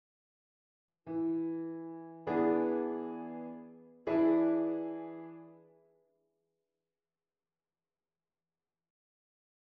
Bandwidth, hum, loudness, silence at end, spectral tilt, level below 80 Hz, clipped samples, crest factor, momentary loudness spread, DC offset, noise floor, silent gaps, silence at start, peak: 4.7 kHz; none; -34 LUFS; 4.1 s; -7 dB/octave; -80 dBFS; under 0.1%; 18 dB; 20 LU; under 0.1%; under -90 dBFS; none; 1.05 s; -20 dBFS